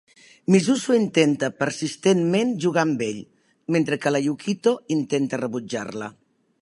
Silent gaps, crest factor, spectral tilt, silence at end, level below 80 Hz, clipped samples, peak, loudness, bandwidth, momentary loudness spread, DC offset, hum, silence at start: none; 18 dB; -5.5 dB/octave; 0.5 s; -70 dBFS; under 0.1%; -4 dBFS; -22 LUFS; 11.5 kHz; 11 LU; under 0.1%; none; 0.5 s